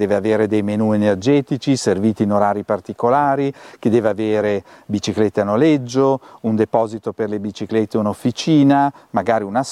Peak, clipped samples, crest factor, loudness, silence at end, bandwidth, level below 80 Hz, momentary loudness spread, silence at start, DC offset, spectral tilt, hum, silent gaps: -2 dBFS; under 0.1%; 14 dB; -18 LUFS; 0 s; 12 kHz; -58 dBFS; 8 LU; 0 s; under 0.1%; -6.5 dB/octave; none; none